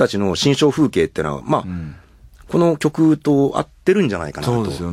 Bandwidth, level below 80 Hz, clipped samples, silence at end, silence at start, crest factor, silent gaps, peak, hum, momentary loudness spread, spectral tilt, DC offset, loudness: 15 kHz; -46 dBFS; under 0.1%; 0 s; 0 s; 16 dB; none; -2 dBFS; none; 8 LU; -6 dB/octave; under 0.1%; -18 LUFS